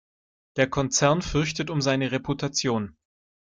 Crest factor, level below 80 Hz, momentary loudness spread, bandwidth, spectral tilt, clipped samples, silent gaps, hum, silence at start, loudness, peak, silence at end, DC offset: 20 dB; -48 dBFS; 7 LU; 9.6 kHz; -4 dB/octave; under 0.1%; none; none; 0.55 s; -25 LUFS; -6 dBFS; 0.65 s; under 0.1%